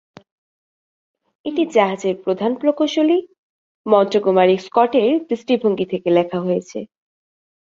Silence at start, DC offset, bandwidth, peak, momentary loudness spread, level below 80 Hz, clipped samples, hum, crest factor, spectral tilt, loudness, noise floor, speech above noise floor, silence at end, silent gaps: 1.45 s; under 0.1%; 7.6 kHz; -2 dBFS; 8 LU; -66 dBFS; under 0.1%; none; 18 dB; -6.5 dB/octave; -18 LUFS; under -90 dBFS; over 73 dB; 0.85 s; 3.38-3.84 s